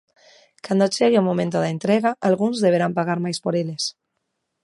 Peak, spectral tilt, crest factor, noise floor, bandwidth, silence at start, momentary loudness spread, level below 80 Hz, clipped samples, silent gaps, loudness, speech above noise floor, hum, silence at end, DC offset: -4 dBFS; -5.5 dB/octave; 18 dB; -76 dBFS; 11.5 kHz; 0.65 s; 7 LU; -68 dBFS; under 0.1%; none; -21 LUFS; 56 dB; none; 0.75 s; under 0.1%